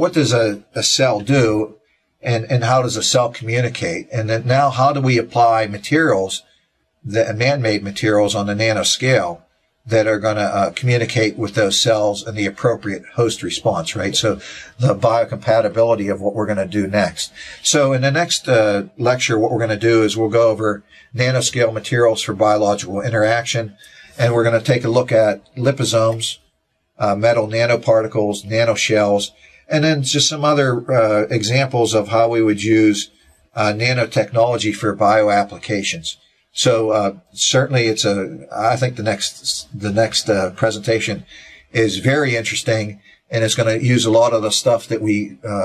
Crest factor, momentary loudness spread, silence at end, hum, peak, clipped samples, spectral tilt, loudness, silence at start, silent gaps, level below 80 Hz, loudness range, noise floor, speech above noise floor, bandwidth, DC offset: 16 dB; 8 LU; 0 s; none; -2 dBFS; under 0.1%; -4.5 dB/octave; -17 LUFS; 0 s; none; -50 dBFS; 2 LU; -67 dBFS; 50 dB; 14 kHz; under 0.1%